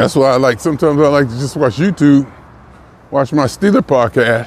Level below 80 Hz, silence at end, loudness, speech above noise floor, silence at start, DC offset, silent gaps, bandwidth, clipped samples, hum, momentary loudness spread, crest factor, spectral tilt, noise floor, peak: -44 dBFS; 0 s; -13 LUFS; 28 dB; 0 s; under 0.1%; none; 14.5 kHz; under 0.1%; none; 6 LU; 12 dB; -6.5 dB/octave; -40 dBFS; 0 dBFS